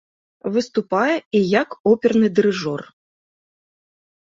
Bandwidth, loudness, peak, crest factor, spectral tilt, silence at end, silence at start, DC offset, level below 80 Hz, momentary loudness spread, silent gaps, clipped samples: 7.6 kHz; -19 LUFS; -2 dBFS; 18 dB; -6 dB/octave; 1.4 s; 0.45 s; under 0.1%; -62 dBFS; 10 LU; 1.26-1.31 s, 1.80-1.84 s; under 0.1%